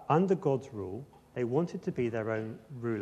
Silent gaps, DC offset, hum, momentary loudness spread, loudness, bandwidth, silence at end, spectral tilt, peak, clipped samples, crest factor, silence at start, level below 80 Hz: none; under 0.1%; none; 14 LU; -33 LUFS; 9 kHz; 0 s; -8.5 dB/octave; -12 dBFS; under 0.1%; 20 dB; 0 s; -68 dBFS